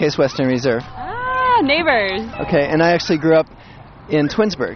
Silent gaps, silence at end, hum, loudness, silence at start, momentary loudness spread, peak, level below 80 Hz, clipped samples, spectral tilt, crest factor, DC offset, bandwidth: none; 0 s; none; -17 LUFS; 0 s; 9 LU; -2 dBFS; -44 dBFS; under 0.1%; -6 dB/octave; 14 dB; under 0.1%; 6.6 kHz